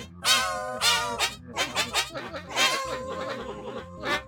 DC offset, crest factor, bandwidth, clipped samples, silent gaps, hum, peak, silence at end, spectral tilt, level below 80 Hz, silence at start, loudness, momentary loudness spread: under 0.1%; 22 dB; 17.5 kHz; under 0.1%; none; none; -6 dBFS; 0 s; -1 dB/octave; -54 dBFS; 0 s; -26 LUFS; 13 LU